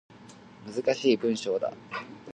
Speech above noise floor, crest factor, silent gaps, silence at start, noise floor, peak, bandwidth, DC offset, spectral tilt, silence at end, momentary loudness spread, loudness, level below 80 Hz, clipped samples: 22 dB; 20 dB; none; 0.1 s; -50 dBFS; -10 dBFS; 9.4 kHz; under 0.1%; -4.5 dB/octave; 0 s; 14 LU; -29 LUFS; -74 dBFS; under 0.1%